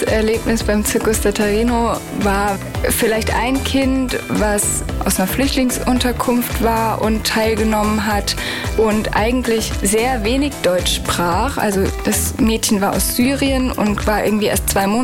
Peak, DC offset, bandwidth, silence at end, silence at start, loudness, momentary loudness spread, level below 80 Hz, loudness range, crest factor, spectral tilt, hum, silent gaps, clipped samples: -4 dBFS; under 0.1%; 17 kHz; 0 s; 0 s; -17 LUFS; 3 LU; -28 dBFS; 1 LU; 12 dB; -4 dB/octave; none; none; under 0.1%